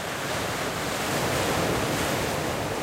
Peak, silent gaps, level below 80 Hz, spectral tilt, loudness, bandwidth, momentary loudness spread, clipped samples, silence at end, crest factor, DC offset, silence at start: -12 dBFS; none; -46 dBFS; -3.5 dB/octave; -26 LUFS; 16 kHz; 4 LU; under 0.1%; 0 s; 14 dB; under 0.1%; 0 s